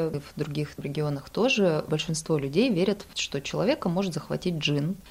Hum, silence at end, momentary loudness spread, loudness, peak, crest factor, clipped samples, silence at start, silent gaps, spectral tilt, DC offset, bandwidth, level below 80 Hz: none; 0 s; 8 LU; -27 LUFS; -10 dBFS; 16 dB; under 0.1%; 0 s; none; -5.5 dB/octave; under 0.1%; 16 kHz; -54 dBFS